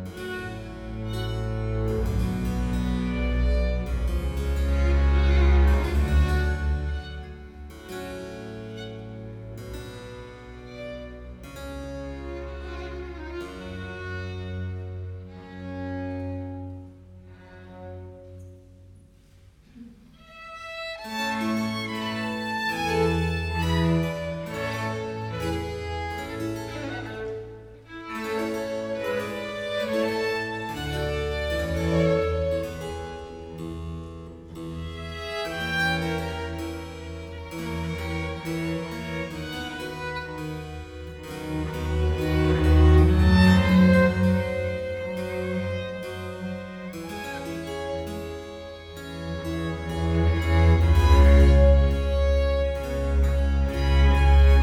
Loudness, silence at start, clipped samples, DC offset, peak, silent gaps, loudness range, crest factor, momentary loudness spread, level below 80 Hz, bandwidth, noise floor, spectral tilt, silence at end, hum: -26 LUFS; 0 s; under 0.1%; under 0.1%; -6 dBFS; none; 18 LU; 18 dB; 20 LU; -28 dBFS; 14.5 kHz; -53 dBFS; -7 dB/octave; 0 s; none